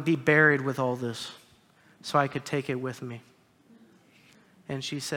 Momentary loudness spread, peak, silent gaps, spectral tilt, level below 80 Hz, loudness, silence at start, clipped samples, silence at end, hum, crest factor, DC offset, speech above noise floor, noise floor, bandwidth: 21 LU; -6 dBFS; none; -5.5 dB/octave; -72 dBFS; -27 LUFS; 0 s; under 0.1%; 0 s; none; 22 dB; under 0.1%; 33 dB; -60 dBFS; 17.5 kHz